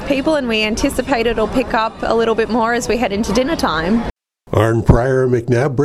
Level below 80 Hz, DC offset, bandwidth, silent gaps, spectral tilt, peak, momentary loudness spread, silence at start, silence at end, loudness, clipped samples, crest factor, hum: -30 dBFS; under 0.1%; 15 kHz; 4.10-4.15 s; -6 dB/octave; 0 dBFS; 5 LU; 0 s; 0 s; -16 LUFS; under 0.1%; 16 dB; none